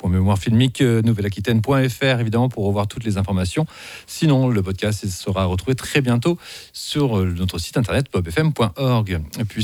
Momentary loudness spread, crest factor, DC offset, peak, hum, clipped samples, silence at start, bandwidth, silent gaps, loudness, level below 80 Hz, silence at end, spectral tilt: 8 LU; 18 dB; under 0.1%; -2 dBFS; none; under 0.1%; 0.05 s; 17 kHz; none; -20 LUFS; -42 dBFS; 0 s; -6 dB/octave